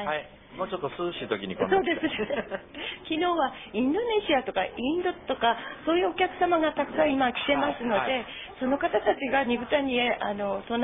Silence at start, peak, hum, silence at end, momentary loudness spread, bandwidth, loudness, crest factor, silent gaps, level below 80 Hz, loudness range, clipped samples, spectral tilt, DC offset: 0 s; -10 dBFS; none; 0 s; 8 LU; 3.9 kHz; -27 LUFS; 18 dB; none; -56 dBFS; 3 LU; under 0.1%; -8.5 dB/octave; under 0.1%